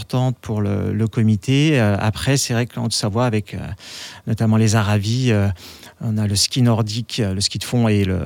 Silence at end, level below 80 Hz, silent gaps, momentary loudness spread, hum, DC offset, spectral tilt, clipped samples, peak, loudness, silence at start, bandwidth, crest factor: 0 s; -50 dBFS; none; 13 LU; none; under 0.1%; -5.5 dB/octave; under 0.1%; -4 dBFS; -19 LUFS; 0 s; 16.5 kHz; 16 dB